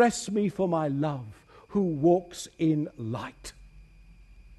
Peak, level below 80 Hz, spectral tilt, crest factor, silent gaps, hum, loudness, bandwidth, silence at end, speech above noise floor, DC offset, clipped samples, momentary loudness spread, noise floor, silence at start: -10 dBFS; -56 dBFS; -6 dB/octave; 18 dB; none; none; -28 LUFS; 12.5 kHz; 0.05 s; 26 dB; under 0.1%; under 0.1%; 16 LU; -53 dBFS; 0 s